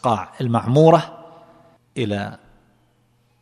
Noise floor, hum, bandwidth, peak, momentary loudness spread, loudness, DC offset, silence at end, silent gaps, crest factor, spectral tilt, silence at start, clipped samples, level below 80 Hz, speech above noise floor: -61 dBFS; none; 11 kHz; 0 dBFS; 20 LU; -18 LUFS; under 0.1%; 1.05 s; none; 20 dB; -7.5 dB/octave; 0.05 s; under 0.1%; -60 dBFS; 44 dB